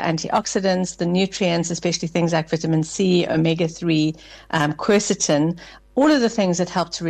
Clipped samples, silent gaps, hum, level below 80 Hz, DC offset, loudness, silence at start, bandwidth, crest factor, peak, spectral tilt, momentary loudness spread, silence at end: under 0.1%; none; none; -52 dBFS; under 0.1%; -20 LUFS; 0 s; 9.6 kHz; 14 dB; -6 dBFS; -5 dB/octave; 5 LU; 0 s